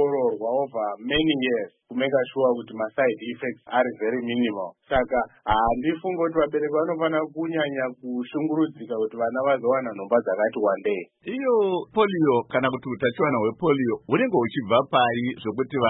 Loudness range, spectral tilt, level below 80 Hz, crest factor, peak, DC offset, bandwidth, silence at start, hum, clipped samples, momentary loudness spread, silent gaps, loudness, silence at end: 3 LU; -10.5 dB/octave; -50 dBFS; 18 dB; -6 dBFS; under 0.1%; 4 kHz; 0 s; none; under 0.1%; 7 LU; none; -24 LUFS; 0 s